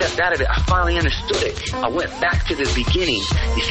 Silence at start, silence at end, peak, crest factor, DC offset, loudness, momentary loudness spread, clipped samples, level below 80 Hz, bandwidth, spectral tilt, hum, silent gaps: 0 s; 0 s; -6 dBFS; 14 dB; under 0.1%; -19 LUFS; 4 LU; under 0.1%; -24 dBFS; 8.8 kHz; -4.5 dB/octave; none; none